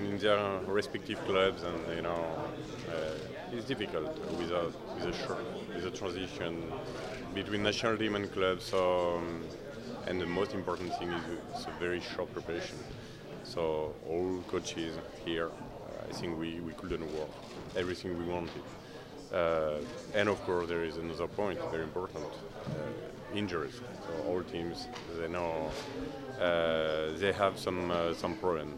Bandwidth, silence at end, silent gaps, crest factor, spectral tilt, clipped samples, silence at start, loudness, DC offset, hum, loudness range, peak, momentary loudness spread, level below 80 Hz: 16 kHz; 0 s; none; 22 dB; -5 dB/octave; under 0.1%; 0 s; -35 LUFS; under 0.1%; none; 5 LU; -14 dBFS; 11 LU; -58 dBFS